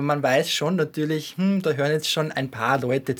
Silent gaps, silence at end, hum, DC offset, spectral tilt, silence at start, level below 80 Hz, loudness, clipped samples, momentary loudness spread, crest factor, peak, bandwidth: none; 0 s; none; under 0.1%; -5 dB/octave; 0 s; -68 dBFS; -23 LUFS; under 0.1%; 5 LU; 18 dB; -6 dBFS; over 20 kHz